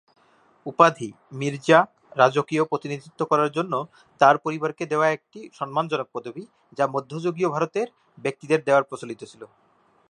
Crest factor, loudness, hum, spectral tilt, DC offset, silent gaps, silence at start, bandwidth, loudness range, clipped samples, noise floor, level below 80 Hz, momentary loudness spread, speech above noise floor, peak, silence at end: 22 dB; -23 LUFS; none; -5.5 dB/octave; under 0.1%; none; 0.65 s; 10.5 kHz; 5 LU; under 0.1%; -59 dBFS; -74 dBFS; 18 LU; 36 dB; -2 dBFS; 0.65 s